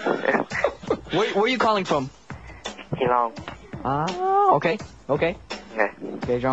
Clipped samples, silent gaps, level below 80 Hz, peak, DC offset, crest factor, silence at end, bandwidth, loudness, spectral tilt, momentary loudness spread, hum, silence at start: under 0.1%; none; -50 dBFS; -4 dBFS; 0.2%; 20 dB; 0 s; 8.2 kHz; -23 LUFS; -5.5 dB/octave; 16 LU; none; 0 s